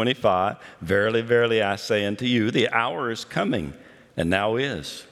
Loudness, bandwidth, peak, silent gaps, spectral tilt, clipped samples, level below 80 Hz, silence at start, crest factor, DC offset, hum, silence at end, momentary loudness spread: -23 LUFS; 14 kHz; -4 dBFS; none; -5.5 dB/octave; under 0.1%; -56 dBFS; 0 s; 18 dB; under 0.1%; none; 0.1 s; 8 LU